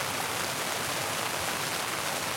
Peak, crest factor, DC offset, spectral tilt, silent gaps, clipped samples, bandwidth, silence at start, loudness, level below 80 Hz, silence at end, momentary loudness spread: -14 dBFS; 18 dB; under 0.1%; -1.5 dB/octave; none; under 0.1%; 16.5 kHz; 0 s; -30 LUFS; -64 dBFS; 0 s; 0 LU